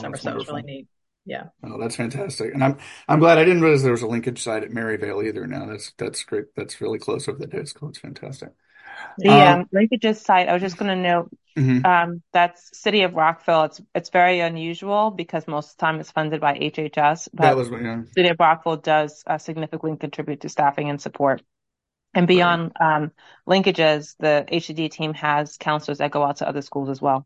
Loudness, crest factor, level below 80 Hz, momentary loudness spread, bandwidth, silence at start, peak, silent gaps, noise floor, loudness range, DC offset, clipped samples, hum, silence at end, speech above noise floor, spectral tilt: -20 LUFS; 20 dB; -64 dBFS; 15 LU; 11.5 kHz; 0 s; 0 dBFS; none; -83 dBFS; 9 LU; under 0.1%; under 0.1%; none; 0.05 s; 62 dB; -5.5 dB/octave